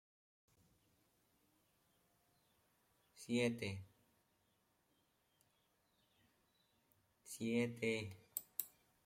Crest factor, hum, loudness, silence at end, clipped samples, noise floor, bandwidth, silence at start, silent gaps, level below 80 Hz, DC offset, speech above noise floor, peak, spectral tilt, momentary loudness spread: 28 dB; none; -43 LUFS; 0.35 s; under 0.1%; -81 dBFS; 16.5 kHz; 3.15 s; none; -84 dBFS; under 0.1%; 40 dB; -22 dBFS; -5 dB/octave; 15 LU